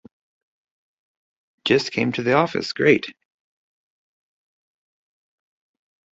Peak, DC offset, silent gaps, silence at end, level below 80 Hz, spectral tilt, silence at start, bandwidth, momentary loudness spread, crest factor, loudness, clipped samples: -2 dBFS; under 0.1%; none; 3.05 s; -64 dBFS; -5.5 dB/octave; 1.65 s; 8 kHz; 7 LU; 22 dB; -20 LUFS; under 0.1%